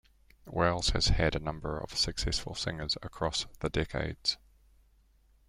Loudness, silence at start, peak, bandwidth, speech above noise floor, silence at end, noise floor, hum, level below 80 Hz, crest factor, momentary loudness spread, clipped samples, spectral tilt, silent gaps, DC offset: -32 LUFS; 0.45 s; -14 dBFS; 14.5 kHz; 33 dB; 1.15 s; -65 dBFS; none; -40 dBFS; 20 dB; 8 LU; under 0.1%; -4 dB/octave; none; under 0.1%